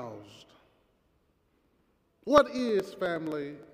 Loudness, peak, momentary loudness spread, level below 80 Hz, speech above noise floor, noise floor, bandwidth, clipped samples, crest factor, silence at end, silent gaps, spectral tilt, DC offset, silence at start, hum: -28 LUFS; -6 dBFS; 20 LU; -62 dBFS; 42 dB; -71 dBFS; 15.5 kHz; under 0.1%; 26 dB; 0.1 s; none; -5.5 dB/octave; under 0.1%; 0 s; none